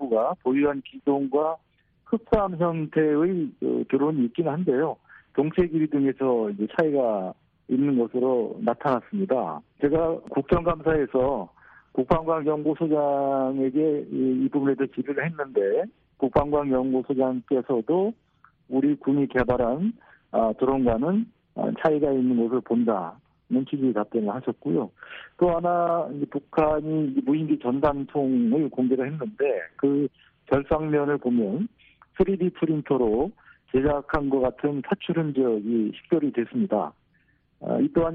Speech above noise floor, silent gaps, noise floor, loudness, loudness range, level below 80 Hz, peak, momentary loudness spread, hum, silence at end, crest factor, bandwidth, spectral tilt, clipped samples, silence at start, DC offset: 41 dB; none; -65 dBFS; -25 LUFS; 1 LU; -48 dBFS; -8 dBFS; 6 LU; none; 0 s; 16 dB; 4.4 kHz; -7.5 dB/octave; under 0.1%; 0 s; under 0.1%